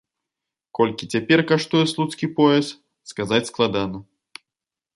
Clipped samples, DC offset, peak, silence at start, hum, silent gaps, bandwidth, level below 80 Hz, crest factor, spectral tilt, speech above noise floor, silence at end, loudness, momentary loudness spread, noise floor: under 0.1%; under 0.1%; -4 dBFS; 0.75 s; none; none; 11.5 kHz; -58 dBFS; 20 dB; -5.5 dB/octave; 68 dB; 0.95 s; -21 LUFS; 15 LU; -88 dBFS